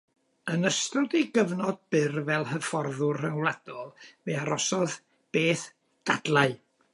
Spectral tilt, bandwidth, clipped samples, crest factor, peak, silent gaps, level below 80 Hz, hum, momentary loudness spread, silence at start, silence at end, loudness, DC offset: -4.5 dB/octave; 11.5 kHz; under 0.1%; 20 dB; -8 dBFS; none; -76 dBFS; none; 15 LU; 0.45 s; 0.35 s; -28 LUFS; under 0.1%